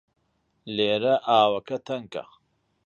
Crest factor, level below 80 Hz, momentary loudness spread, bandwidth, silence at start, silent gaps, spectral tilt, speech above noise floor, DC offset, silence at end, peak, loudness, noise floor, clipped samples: 20 dB; -70 dBFS; 14 LU; 7.2 kHz; 0.65 s; none; -5.5 dB/octave; 47 dB; under 0.1%; 0.65 s; -6 dBFS; -24 LUFS; -71 dBFS; under 0.1%